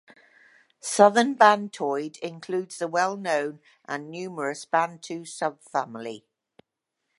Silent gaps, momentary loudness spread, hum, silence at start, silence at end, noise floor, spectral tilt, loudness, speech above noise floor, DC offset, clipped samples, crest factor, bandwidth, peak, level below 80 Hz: none; 18 LU; none; 0.85 s; 1 s; -82 dBFS; -3.5 dB/octave; -25 LUFS; 57 dB; under 0.1%; under 0.1%; 24 dB; 11.5 kHz; -2 dBFS; -82 dBFS